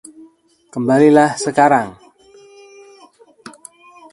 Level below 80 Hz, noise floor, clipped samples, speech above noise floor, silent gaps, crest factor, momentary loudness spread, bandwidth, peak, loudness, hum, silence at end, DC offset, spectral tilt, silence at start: -60 dBFS; -50 dBFS; under 0.1%; 37 dB; none; 18 dB; 22 LU; 11.5 kHz; 0 dBFS; -13 LUFS; none; 2.2 s; under 0.1%; -5.5 dB/octave; 0.75 s